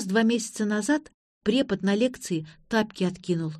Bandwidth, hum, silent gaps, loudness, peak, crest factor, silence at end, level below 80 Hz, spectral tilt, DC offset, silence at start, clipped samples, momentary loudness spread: 13 kHz; none; 1.14-1.41 s; -26 LUFS; -8 dBFS; 18 dB; 0 s; -62 dBFS; -5 dB/octave; under 0.1%; 0 s; under 0.1%; 8 LU